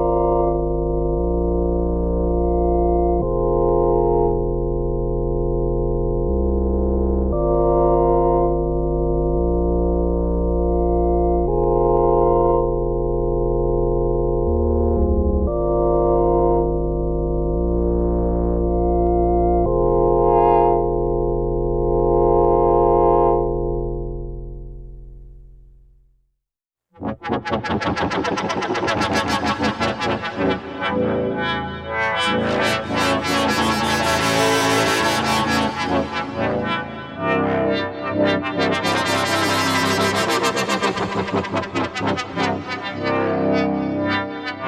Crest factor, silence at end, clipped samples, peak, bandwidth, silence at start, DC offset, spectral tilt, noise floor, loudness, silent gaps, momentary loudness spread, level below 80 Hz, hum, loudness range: 16 dB; 0 s; under 0.1%; -2 dBFS; 15.5 kHz; 0 s; under 0.1%; -5.5 dB/octave; -85 dBFS; -19 LUFS; none; 7 LU; -26 dBFS; none; 4 LU